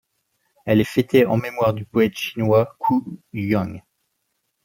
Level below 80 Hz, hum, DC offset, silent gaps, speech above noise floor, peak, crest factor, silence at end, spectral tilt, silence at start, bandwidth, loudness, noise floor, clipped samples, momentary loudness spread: -56 dBFS; none; under 0.1%; none; 54 dB; -4 dBFS; 18 dB; 0.85 s; -7 dB/octave; 0.65 s; 17 kHz; -20 LUFS; -73 dBFS; under 0.1%; 13 LU